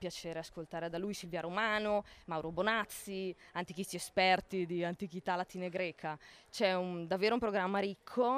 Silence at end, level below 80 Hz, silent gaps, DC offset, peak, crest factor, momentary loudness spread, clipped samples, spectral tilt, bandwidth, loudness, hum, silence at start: 0 s; -66 dBFS; none; under 0.1%; -18 dBFS; 18 dB; 11 LU; under 0.1%; -4.5 dB/octave; 15.5 kHz; -36 LUFS; none; 0 s